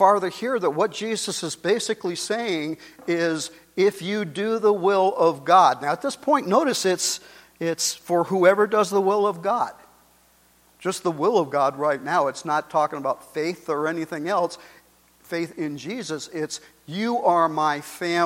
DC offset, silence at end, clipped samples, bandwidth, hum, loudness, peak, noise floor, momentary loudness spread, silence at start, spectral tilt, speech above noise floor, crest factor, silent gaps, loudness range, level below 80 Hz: under 0.1%; 0 s; under 0.1%; 16.5 kHz; none; -23 LUFS; -2 dBFS; -58 dBFS; 11 LU; 0 s; -4 dB/octave; 36 dB; 20 dB; none; 7 LU; -70 dBFS